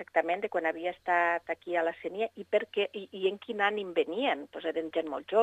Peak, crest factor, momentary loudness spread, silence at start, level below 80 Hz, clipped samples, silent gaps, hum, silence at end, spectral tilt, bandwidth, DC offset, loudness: -12 dBFS; 20 dB; 7 LU; 0 s; -76 dBFS; under 0.1%; none; none; 0 s; -5 dB/octave; 9.2 kHz; under 0.1%; -31 LUFS